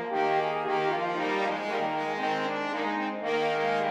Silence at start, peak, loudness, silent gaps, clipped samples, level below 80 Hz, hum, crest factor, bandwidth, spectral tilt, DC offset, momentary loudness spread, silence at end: 0 s; -14 dBFS; -29 LUFS; none; under 0.1%; -82 dBFS; none; 14 dB; 12.5 kHz; -5 dB/octave; under 0.1%; 3 LU; 0 s